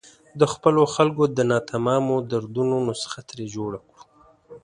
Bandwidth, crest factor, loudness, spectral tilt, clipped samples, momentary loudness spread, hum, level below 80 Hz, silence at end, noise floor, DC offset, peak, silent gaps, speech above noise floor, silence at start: 11.5 kHz; 22 dB; -22 LUFS; -6 dB/octave; under 0.1%; 14 LU; none; -60 dBFS; 0.05 s; -53 dBFS; under 0.1%; -2 dBFS; none; 31 dB; 0.35 s